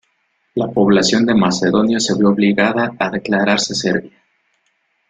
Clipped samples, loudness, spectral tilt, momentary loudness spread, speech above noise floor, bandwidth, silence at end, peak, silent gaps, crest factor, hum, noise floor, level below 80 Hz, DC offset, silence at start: under 0.1%; -15 LUFS; -4.5 dB/octave; 7 LU; 50 dB; 9.4 kHz; 1 s; 0 dBFS; none; 16 dB; none; -65 dBFS; -52 dBFS; under 0.1%; 0.55 s